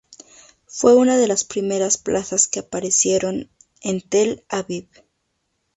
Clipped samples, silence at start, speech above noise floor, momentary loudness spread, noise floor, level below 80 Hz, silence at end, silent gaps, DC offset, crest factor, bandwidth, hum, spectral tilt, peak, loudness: under 0.1%; 0.1 s; 53 dB; 15 LU; -72 dBFS; -58 dBFS; 0.95 s; none; under 0.1%; 20 dB; 8.4 kHz; none; -3.5 dB/octave; 0 dBFS; -19 LUFS